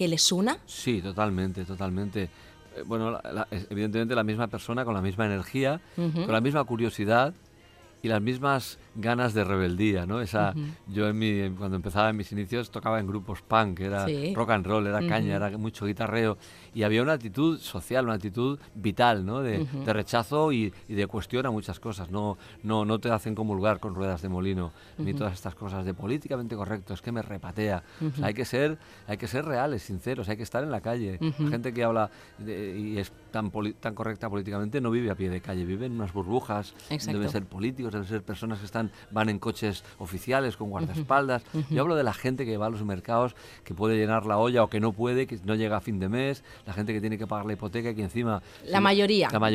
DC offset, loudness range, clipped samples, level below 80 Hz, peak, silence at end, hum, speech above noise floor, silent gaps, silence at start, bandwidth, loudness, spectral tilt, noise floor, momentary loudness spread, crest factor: under 0.1%; 4 LU; under 0.1%; -56 dBFS; -8 dBFS; 0 s; none; 26 dB; none; 0 s; 15.5 kHz; -29 LUFS; -5.5 dB/octave; -54 dBFS; 9 LU; 22 dB